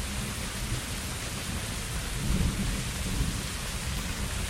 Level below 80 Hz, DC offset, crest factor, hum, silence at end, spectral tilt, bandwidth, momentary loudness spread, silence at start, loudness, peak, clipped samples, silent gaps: -36 dBFS; under 0.1%; 16 dB; none; 0 s; -3.5 dB/octave; 16 kHz; 4 LU; 0 s; -32 LUFS; -14 dBFS; under 0.1%; none